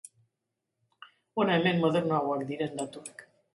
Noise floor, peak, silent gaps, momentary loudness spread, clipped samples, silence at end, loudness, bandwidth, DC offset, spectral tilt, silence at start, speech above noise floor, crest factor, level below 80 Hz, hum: -85 dBFS; -12 dBFS; none; 14 LU; under 0.1%; 0.3 s; -29 LUFS; 11.5 kHz; under 0.1%; -6 dB/octave; 1.35 s; 56 dB; 20 dB; -74 dBFS; none